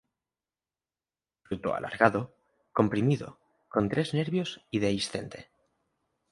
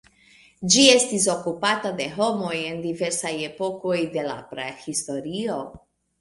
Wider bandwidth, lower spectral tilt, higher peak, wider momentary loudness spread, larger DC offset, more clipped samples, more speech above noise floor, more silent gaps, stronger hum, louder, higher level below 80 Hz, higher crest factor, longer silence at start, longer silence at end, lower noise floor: about the same, 11.5 kHz vs 11.5 kHz; first, -6 dB/octave vs -2.5 dB/octave; second, -4 dBFS vs 0 dBFS; about the same, 14 LU vs 16 LU; neither; neither; first, over 62 dB vs 32 dB; neither; neither; second, -29 LUFS vs -23 LUFS; about the same, -60 dBFS vs -62 dBFS; about the same, 26 dB vs 24 dB; first, 1.5 s vs 0.6 s; first, 0.9 s vs 0.45 s; first, under -90 dBFS vs -55 dBFS